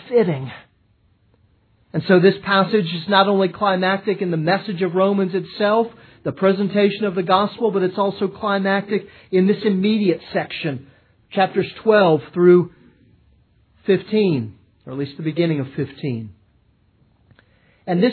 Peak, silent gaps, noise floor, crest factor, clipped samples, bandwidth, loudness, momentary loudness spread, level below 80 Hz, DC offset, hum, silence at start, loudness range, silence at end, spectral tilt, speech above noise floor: 0 dBFS; none; -59 dBFS; 20 dB; under 0.1%; 4.6 kHz; -19 LUFS; 13 LU; -62 dBFS; under 0.1%; none; 0.05 s; 5 LU; 0 s; -10 dB/octave; 41 dB